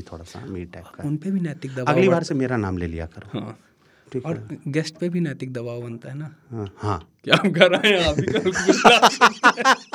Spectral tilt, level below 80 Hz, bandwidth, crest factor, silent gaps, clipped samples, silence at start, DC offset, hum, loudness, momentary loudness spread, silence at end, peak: -4.5 dB/octave; -50 dBFS; 16.5 kHz; 22 dB; none; under 0.1%; 0 s; under 0.1%; none; -19 LUFS; 19 LU; 0.1 s; 0 dBFS